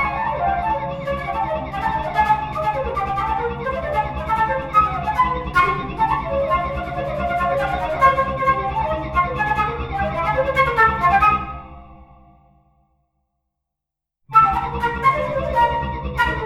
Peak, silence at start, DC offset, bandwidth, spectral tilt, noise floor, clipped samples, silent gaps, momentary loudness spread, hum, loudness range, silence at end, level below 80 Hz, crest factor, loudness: -2 dBFS; 0 s; under 0.1%; 15.5 kHz; -6.5 dB/octave; -84 dBFS; under 0.1%; none; 9 LU; none; 3 LU; 0 s; -34 dBFS; 18 dB; -20 LUFS